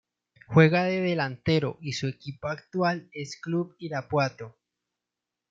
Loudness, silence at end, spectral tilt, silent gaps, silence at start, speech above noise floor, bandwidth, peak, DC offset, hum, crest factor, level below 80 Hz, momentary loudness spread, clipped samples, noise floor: -27 LUFS; 1 s; -6.5 dB/octave; none; 0.5 s; 61 dB; 7.6 kHz; -6 dBFS; under 0.1%; 60 Hz at -55 dBFS; 22 dB; -64 dBFS; 15 LU; under 0.1%; -87 dBFS